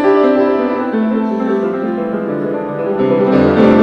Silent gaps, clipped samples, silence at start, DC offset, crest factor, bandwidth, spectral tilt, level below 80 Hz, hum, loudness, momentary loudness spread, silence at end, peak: none; under 0.1%; 0 s; under 0.1%; 12 dB; 6.2 kHz; -9 dB/octave; -50 dBFS; none; -14 LUFS; 8 LU; 0 s; 0 dBFS